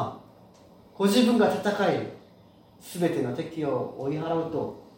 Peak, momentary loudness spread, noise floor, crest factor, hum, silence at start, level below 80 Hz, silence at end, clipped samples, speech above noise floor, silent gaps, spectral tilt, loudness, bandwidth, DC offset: -10 dBFS; 12 LU; -55 dBFS; 18 dB; none; 0 s; -66 dBFS; 0.15 s; under 0.1%; 29 dB; none; -5.5 dB/octave; -26 LUFS; 16.5 kHz; under 0.1%